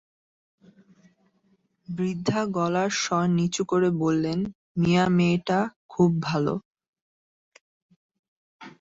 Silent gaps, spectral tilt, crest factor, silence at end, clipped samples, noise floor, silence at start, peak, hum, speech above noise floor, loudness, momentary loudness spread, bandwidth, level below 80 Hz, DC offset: 4.55-4.75 s, 5.76-5.89 s, 6.65-6.71 s, 6.88-6.93 s, 7.01-7.52 s, 7.61-7.89 s, 7.96-8.09 s, 8.19-8.60 s; -6 dB/octave; 18 dB; 0.1 s; under 0.1%; -67 dBFS; 1.9 s; -8 dBFS; none; 44 dB; -25 LUFS; 9 LU; 7.8 kHz; -60 dBFS; under 0.1%